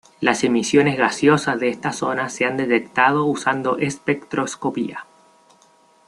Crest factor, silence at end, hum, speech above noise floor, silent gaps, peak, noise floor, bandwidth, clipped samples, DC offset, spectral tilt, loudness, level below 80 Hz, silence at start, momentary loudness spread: 20 dB; 1.05 s; none; 35 dB; none; -2 dBFS; -55 dBFS; 12 kHz; under 0.1%; under 0.1%; -4.5 dB/octave; -20 LUFS; -60 dBFS; 0.2 s; 8 LU